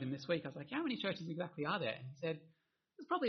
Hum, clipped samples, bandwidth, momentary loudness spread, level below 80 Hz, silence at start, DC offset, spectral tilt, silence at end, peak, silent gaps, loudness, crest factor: none; under 0.1%; 6.2 kHz; 5 LU; -82 dBFS; 0 s; under 0.1%; -4 dB/octave; 0 s; -24 dBFS; none; -41 LUFS; 18 dB